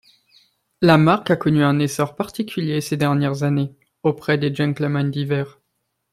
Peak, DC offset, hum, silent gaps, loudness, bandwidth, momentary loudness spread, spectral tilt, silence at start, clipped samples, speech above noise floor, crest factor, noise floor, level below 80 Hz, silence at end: -2 dBFS; under 0.1%; none; none; -20 LUFS; 15 kHz; 10 LU; -6.5 dB/octave; 0.8 s; under 0.1%; 55 dB; 18 dB; -74 dBFS; -56 dBFS; 0.65 s